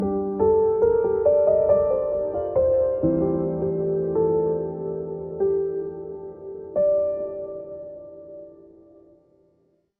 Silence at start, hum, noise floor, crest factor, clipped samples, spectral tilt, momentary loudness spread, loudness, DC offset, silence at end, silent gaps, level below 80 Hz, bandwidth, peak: 0 s; none; -65 dBFS; 16 dB; under 0.1%; -13 dB/octave; 18 LU; -22 LUFS; under 0.1%; 1.35 s; none; -50 dBFS; 2.5 kHz; -8 dBFS